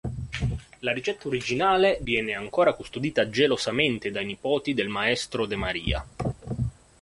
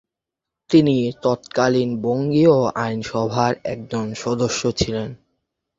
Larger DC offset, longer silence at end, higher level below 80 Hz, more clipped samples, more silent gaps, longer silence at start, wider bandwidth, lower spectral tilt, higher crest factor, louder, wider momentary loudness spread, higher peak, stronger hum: neither; second, 0.3 s vs 0.65 s; first, -42 dBFS vs -48 dBFS; neither; neither; second, 0.05 s vs 0.7 s; first, 11.5 kHz vs 7.8 kHz; about the same, -5 dB/octave vs -6 dB/octave; about the same, 20 dB vs 18 dB; second, -26 LUFS vs -20 LUFS; about the same, 9 LU vs 11 LU; second, -8 dBFS vs -2 dBFS; neither